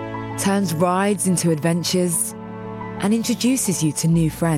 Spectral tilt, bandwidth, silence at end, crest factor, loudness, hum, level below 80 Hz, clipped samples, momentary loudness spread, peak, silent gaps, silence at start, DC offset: -5 dB/octave; 16.5 kHz; 0 s; 14 dB; -20 LUFS; none; -48 dBFS; under 0.1%; 9 LU; -6 dBFS; none; 0 s; under 0.1%